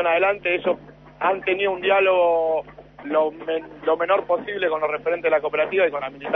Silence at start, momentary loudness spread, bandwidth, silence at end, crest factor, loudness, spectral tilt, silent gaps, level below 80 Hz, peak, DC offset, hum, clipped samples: 0 s; 8 LU; 4 kHz; 0 s; 14 dB; -22 LUFS; -7 dB/octave; none; -58 dBFS; -8 dBFS; under 0.1%; none; under 0.1%